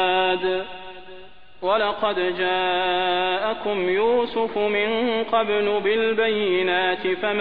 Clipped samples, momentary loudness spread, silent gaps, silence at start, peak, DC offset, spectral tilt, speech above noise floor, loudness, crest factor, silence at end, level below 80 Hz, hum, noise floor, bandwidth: under 0.1%; 5 LU; none; 0 s; -8 dBFS; 0.8%; -7 dB/octave; 24 dB; -22 LUFS; 14 dB; 0 s; -56 dBFS; none; -46 dBFS; 5 kHz